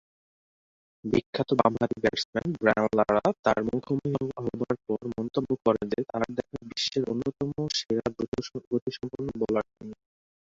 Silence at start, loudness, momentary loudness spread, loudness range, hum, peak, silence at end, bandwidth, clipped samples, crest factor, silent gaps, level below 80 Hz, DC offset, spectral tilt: 1.05 s; -28 LUFS; 10 LU; 5 LU; none; -4 dBFS; 0.5 s; 7.8 kHz; under 0.1%; 24 dB; 1.26-1.33 s, 2.25-2.33 s, 3.39-3.43 s, 8.28-8.32 s, 8.67-8.71 s, 8.82-8.86 s; -58 dBFS; under 0.1%; -5.5 dB/octave